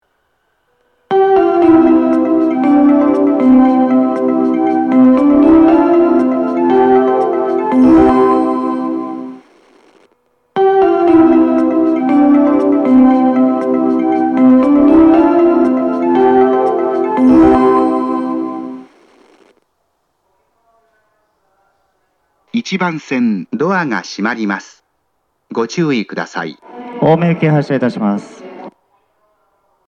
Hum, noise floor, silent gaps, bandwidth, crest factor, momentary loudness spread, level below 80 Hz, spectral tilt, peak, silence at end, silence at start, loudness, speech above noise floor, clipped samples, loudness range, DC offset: none; -65 dBFS; none; 7 kHz; 12 dB; 13 LU; -44 dBFS; -8 dB/octave; 0 dBFS; 1.2 s; 1.1 s; -11 LUFS; 50 dB; under 0.1%; 9 LU; under 0.1%